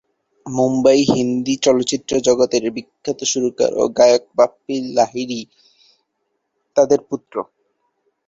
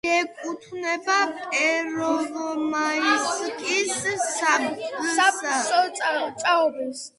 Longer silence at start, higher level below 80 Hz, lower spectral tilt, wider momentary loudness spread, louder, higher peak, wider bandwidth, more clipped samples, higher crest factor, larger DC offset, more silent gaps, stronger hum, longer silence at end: first, 0.45 s vs 0.05 s; first, -56 dBFS vs -72 dBFS; first, -4 dB/octave vs -1.5 dB/octave; first, 13 LU vs 7 LU; first, -17 LUFS vs -23 LUFS; first, 0 dBFS vs -6 dBFS; second, 8 kHz vs 11.5 kHz; neither; about the same, 18 dB vs 18 dB; neither; neither; neither; first, 0.85 s vs 0.1 s